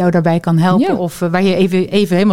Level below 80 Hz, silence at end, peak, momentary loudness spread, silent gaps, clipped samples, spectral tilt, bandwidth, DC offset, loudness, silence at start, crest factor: -50 dBFS; 0 s; -2 dBFS; 4 LU; none; under 0.1%; -7 dB/octave; 15 kHz; under 0.1%; -14 LUFS; 0 s; 10 dB